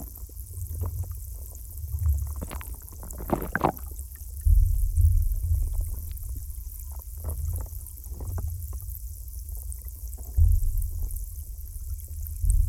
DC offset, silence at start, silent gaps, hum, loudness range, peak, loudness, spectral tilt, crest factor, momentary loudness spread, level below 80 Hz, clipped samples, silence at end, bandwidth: under 0.1%; 0 s; none; none; 8 LU; -8 dBFS; -31 LUFS; -6.5 dB/octave; 20 dB; 15 LU; -28 dBFS; under 0.1%; 0 s; 17.5 kHz